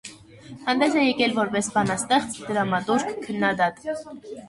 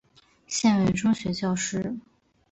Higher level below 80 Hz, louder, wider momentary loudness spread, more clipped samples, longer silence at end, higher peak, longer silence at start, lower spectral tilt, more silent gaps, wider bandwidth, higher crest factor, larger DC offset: second, -60 dBFS vs -54 dBFS; about the same, -23 LUFS vs -25 LUFS; about the same, 12 LU vs 11 LU; neither; second, 0 s vs 0.5 s; first, -6 dBFS vs -12 dBFS; second, 0.05 s vs 0.5 s; about the same, -4 dB/octave vs -4.5 dB/octave; neither; first, 11.5 kHz vs 8.2 kHz; about the same, 18 dB vs 16 dB; neither